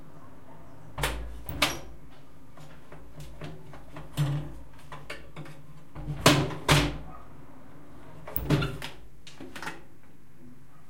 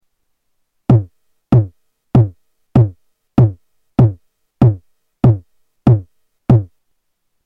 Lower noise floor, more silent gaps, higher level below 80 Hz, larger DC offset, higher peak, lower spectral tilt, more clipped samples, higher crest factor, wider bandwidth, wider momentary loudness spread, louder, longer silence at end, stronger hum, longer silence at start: second, -56 dBFS vs -67 dBFS; neither; second, -44 dBFS vs -36 dBFS; first, 1% vs under 0.1%; second, -4 dBFS vs 0 dBFS; second, -4.5 dB/octave vs -11 dB/octave; neither; first, 30 dB vs 16 dB; first, 16.5 kHz vs 3.7 kHz; first, 27 LU vs 11 LU; second, -29 LUFS vs -15 LUFS; second, 0.35 s vs 0.8 s; neither; second, 0 s vs 0.9 s